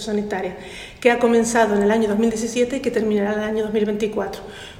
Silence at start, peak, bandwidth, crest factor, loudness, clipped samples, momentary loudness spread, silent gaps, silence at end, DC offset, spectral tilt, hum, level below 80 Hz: 0 s; -4 dBFS; 16 kHz; 16 dB; -20 LUFS; under 0.1%; 12 LU; none; 0 s; under 0.1%; -5 dB/octave; none; -48 dBFS